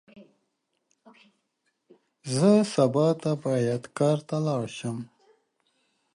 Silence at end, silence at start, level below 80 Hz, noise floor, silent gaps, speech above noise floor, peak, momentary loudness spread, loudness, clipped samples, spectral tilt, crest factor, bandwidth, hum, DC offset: 1.1 s; 0.15 s; -72 dBFS; -77 dBFS; none; 52 dB; -8 dBFS; 14 LU; -25 LUFS; under 0.1%; -6.5 dB/octave; 20 dB; 11.5 kHz; none; under 0.1%